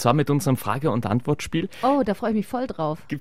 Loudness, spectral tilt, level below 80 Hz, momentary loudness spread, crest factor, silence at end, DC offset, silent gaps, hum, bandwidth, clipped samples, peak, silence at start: -24 LUFS; -6.5 dB/octave; -52 dBFS; 6 LU; 18 dB; 0 s; 0.9%; none; none; 16 kHz; under 0.1%; -4 dBFS; 0 s